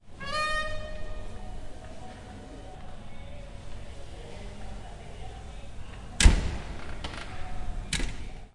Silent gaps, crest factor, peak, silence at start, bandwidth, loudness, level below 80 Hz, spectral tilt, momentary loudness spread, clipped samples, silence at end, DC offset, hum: none; 26 dB; -4 dBFS; 0.05 s; 11.5 kHz; -32 LUFS; -34 dBFS; -3.5 dB/octave; 17 LU; under 0.1%; 0.05 s; under 0.1%; none